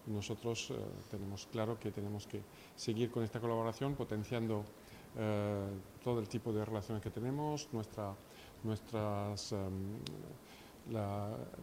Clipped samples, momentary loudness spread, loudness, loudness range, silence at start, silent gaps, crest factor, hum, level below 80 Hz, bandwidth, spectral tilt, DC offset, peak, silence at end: under 0.1%; 11 LU; -41 LUFS; 3 LU; 0 s; none; 18 dB; none; -66 dBFS; 16 kHz; -6 dB/octave; under 0.1%; -24 dBFS; 0 s